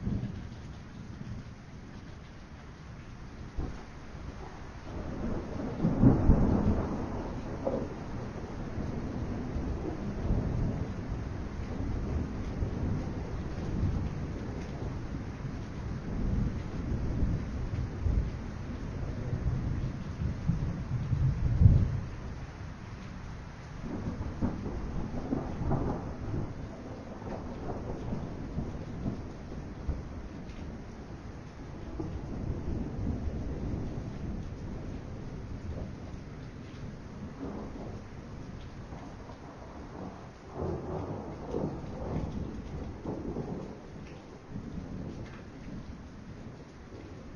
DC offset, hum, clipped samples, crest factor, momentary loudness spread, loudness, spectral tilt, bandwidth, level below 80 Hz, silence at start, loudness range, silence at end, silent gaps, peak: under 0.1%; none; under 0.1%; 26 dB; 13 LU; -36 LUFS; -8.5 dB/octave; 7.2 kHz; -40 dBFS; 0 s; 13 LU; 0 s; none; -8 dBFS